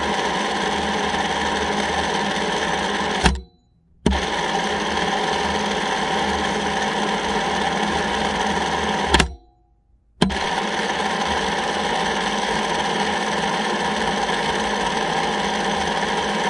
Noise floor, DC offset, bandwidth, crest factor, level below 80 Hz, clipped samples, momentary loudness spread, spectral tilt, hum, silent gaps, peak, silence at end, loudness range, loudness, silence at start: -58 dBFS; under 0.1%; 11.5 kHz; 22 dB; -38 dBFS; under 0.1%; 1 LU; -3.5 dB/octave; none; none; 0 dBFS; 0 s; 1 LU; -21 LUFS; 0 s